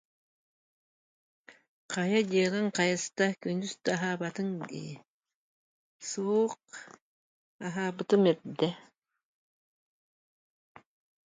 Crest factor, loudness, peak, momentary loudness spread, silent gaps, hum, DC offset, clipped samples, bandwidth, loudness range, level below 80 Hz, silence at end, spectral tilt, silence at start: 20 dB; -30 LUFS; -12 dBFS; 17 LU; 1.68-1.89 s, 5.08-5.20 s, 5.35-6.00 s, 7.01-7.59 s; none; under 0.1%; under 0.1%; 9.4 kHz; 6 LU; -78 dBFS; 2.45 s; -5 dB/octave; 1.5 s